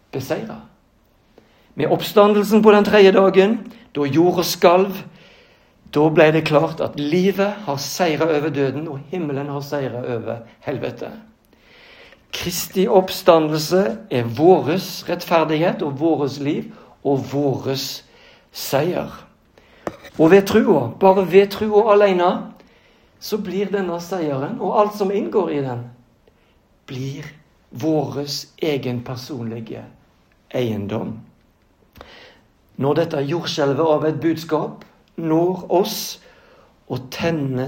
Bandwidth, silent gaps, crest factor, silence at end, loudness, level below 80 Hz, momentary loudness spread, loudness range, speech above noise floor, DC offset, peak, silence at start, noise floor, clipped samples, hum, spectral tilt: 16.5 kHz; none; 20 dB; 0 s; -19 LUFS; -58 dBFS; 17 LU; 11 LU; 39 dB; under 0.1%; 0 dBFS; 0.15 s; -57 dBFS; under 0.1%; none; -5.5 dB/octave